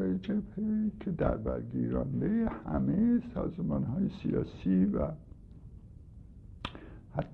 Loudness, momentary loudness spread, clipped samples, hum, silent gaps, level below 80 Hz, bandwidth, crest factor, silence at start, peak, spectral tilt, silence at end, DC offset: -32 LUFS; 24 LU; under 0.1%; none; none; -46 dBFS; 5.8 kHz; 16 dB; 0 s; -16 dBFS; -10 dB/octave; 0 s; under 0.1%